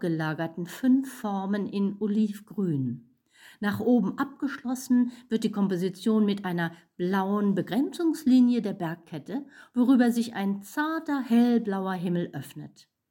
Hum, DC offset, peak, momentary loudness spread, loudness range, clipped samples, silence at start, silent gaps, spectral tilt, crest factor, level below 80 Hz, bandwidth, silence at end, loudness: none; under 0.1%; -10 dBFS; 12 LU; 3 LU; under 0.1%; 0 s; none; -7 dB/octave; 16 dB; -74 dBFS; 17 kHz; 0.4 s; -27 LUFS